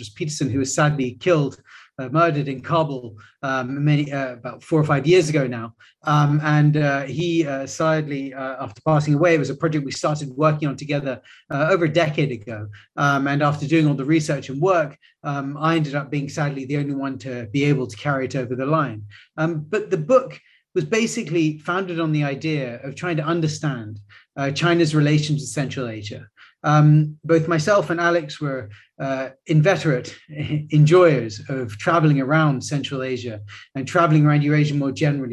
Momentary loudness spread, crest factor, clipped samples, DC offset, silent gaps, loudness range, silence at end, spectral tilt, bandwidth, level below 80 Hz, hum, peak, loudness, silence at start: 13 LU; 18 dB; under 0.1%; under 0.1%; none; 4 LU; 0 s; -6.5 dB/octave; 11 kHz; -58 dBFS; none; -2 dBFS; -21 LUFS; 0 s